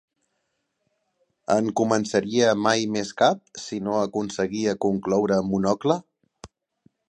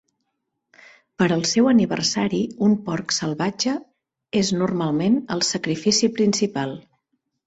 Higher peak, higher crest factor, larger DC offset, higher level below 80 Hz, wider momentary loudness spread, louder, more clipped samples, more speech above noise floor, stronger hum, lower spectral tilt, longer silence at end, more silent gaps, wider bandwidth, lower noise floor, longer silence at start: about the same, -4 dBFS vs -6 dBFS; about the same, 20 dB vs 16 dB; neither; about the same, -60 dBFS vs -60 dBFS; about the same, 7 LU vs 7 LU; about the same, -23 LUFS vs -21 LUFS; neither; about the same, 53 dB vs 56 dB; neither; about the same, -5 dB/octave vs -4.5 dB/octave; about the same, 0.65 s vs 0.65 s; neither; first, 10 kHz vs 8.2 kHz; about the same, -76 dBFS vs -77 dBFS; first, 1.5 s vs 1.2 s